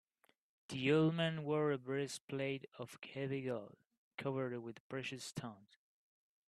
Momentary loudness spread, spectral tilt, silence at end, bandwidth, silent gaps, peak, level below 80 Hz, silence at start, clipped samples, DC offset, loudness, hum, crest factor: 15 LU; -6 dB/octave; 0.9 s; 13 kHz; 2.21-2.28 s, 3.98-4.18 s, 4.80-4.90 s; -22 dBFS; -80 dBFS; 0.7 s; under 0.1%; under 0.1%; -40 LUFS; none; 20 dB